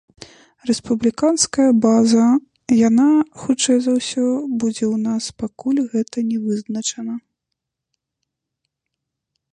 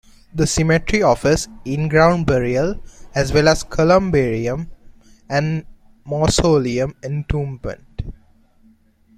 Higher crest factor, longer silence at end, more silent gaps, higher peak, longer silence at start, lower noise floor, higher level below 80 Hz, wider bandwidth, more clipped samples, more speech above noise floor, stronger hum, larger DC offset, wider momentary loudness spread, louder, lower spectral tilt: about the same, 16 dB vs 18 dB; first, 2.35 s vs 1.05 s; neither; about the same, -2 dBFS vs -2 dBFS; first, 0.65 s vs 0.35 s; first, -80 dBFS vs -53 dBFS; second, -58 dBFS vs -34 dBFS; second, 11 kHz vs 14.5 kHz; neither; first, 63 dB vs 36 dB; neither; neither; second, 10 LU vs 16 LU; about the same, -18 LUFS vs -18 LUFS; about the same, -4.5 dB/octave vs -5.5 dB/octave